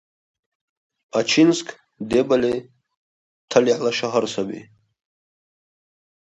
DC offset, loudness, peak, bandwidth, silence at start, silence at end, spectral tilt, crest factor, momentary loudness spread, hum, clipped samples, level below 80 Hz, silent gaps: under 0.1%; -20 LUFS; -2 dBFS; 9.4 kHz; 1.15 s; 1.65 s; -4.5 dB/octave; 22 dB; 14 LU; none; under 0.1%; -60 dBFS; 2.97-3.48 s